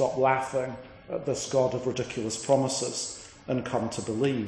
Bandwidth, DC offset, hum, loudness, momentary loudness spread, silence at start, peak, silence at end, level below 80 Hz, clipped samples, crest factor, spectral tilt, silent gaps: 10.5 kHz; under 0.1%; none; -29 LUFS; 11 LU; 0 s; -8 dBFS; 0 s; -60 dBFS; under 0.1%; 20 dB; -4.5 dB/octave; none